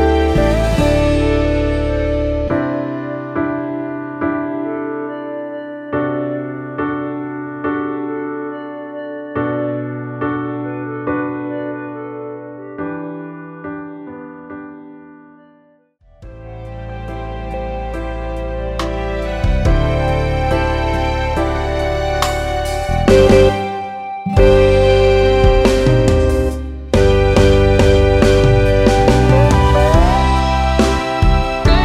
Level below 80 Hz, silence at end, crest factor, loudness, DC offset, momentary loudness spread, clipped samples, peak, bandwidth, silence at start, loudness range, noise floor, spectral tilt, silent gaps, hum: -22 dBFS; 0 s; 16 dB; -16 LUFS; under 0.1%; 16 LU; under 0.1%; 0 dBFS; 14 kHz; 0 s; 17 LU; -52 dBFS; -6.5 dB/octave; none; none